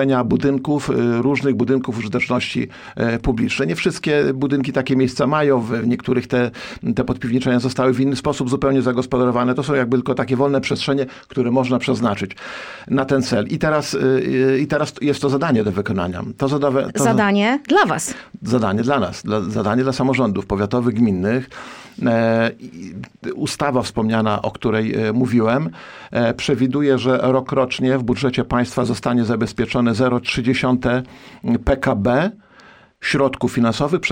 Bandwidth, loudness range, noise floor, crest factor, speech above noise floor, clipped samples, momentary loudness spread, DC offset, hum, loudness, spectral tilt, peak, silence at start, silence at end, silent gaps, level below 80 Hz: 16 kHz; 2 LU; -47 dBFS; 16 dB; 29 dB; under 0.1%; 6 LU; under 0.1%; none; -19 LUFS; -6 dB/octave; -2 dBFS; 0 s; 0 s; none; -42 dBFS